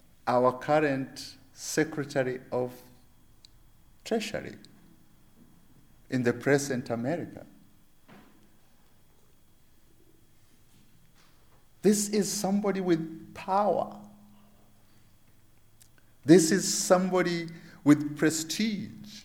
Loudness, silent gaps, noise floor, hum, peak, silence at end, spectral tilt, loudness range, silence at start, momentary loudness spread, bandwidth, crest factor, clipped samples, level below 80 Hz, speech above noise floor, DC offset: -28 LUFS; none; -58 dBFS; none; -6 dBFS; 0.05 s; -4.5 dB/octave; 12 LU; 0.25 s; 16 LU; 19 kHz; 24 dB; under 0.1%; -64 dBFS; 31 dB; under 0.1%